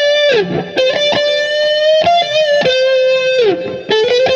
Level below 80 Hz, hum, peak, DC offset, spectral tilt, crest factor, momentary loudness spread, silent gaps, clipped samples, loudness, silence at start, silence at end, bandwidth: -58 dBFS; none; 0 dBFS; under 0.1%; -3.5 dB/octave; 12 dB; 4 LU; none; under 0.1%; -12 LUFS; 0 s; 0 s; 8.2 kHz